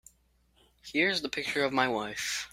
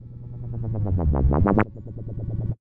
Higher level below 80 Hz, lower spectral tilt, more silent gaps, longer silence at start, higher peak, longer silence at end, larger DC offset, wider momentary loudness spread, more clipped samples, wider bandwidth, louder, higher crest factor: second, -66 dBFS vs -30 dBFS; second, -2.5 dB/octave vs -12 dB/octave; neither; first, 0.85 s vs 0 s; second, -10 dBFS vs -2 dBFS; about the same, 0.05 s vs 0.05 s; neither; second, 6 LU vs 16 LU; neither; first, 16 kHz vs 3.3 kHz; second, -29 LUFS vs -24 LUFS; about the same, 24 dB vs 20 dB